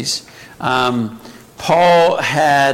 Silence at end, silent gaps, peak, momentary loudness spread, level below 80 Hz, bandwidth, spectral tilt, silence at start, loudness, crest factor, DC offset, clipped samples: 0 s; none; -2 dBFS; 13 LU; -52 dBFS; 16.5 kHz; -4 dB/octave; 0 s; -14 LUFS; 14 dB; under 0.1%; under 0.1%